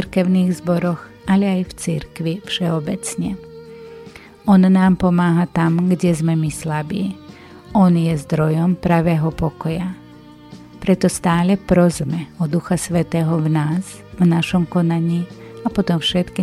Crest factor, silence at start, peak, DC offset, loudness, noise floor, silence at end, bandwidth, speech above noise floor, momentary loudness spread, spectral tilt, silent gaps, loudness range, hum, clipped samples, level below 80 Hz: 16 dB; 0 s; -2 dBFS; under 0.1%; -18 LUFS; -41 dBFS; 0 s; 13 kHz; 24 dB; 11 LU; -6.5 dB/octave; none; 4 LU; none; under 0.1%; -44 dBFS